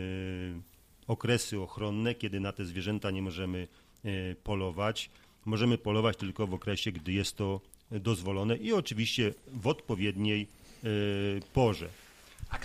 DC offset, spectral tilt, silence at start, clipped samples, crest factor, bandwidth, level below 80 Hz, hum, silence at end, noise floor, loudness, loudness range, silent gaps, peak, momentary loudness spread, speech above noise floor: under 0.1%; -5.5 dB/octave; 0 s; under 0.1%; 18 dB; 15 kHz; -54 dBFS; none; 0 s; -54 dBFS; -33 LUFS; 3 LU; none; -14 dBFS; 13 LU; 21 dB